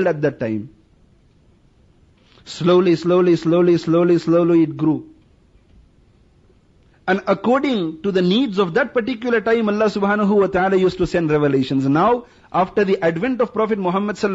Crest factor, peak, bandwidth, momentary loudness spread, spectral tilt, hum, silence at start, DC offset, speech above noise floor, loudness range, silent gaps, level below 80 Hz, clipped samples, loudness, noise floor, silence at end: 14 dB; -6 dBFS; 8 kHz; 6 LU; -7.5 dB/octave; none; 0 s; under 0.1%; 37 dB; 5 LU; none; -50 dBFS; under 0.1%; -18 LUFS; -54 dBFS; 0 s